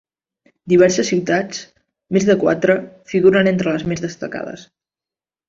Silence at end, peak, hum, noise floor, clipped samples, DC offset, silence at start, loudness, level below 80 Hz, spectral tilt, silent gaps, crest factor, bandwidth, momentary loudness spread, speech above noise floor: 0.85 s; -2 dBFS; none; under -90 dBFS; under 0.1%; under 0.1%; 0.65 s; -17 LUFS; -54 dBFS; -5.5 dB/octave; none; 16 dB; 7.8 kHz; 15 LU; over 74 dB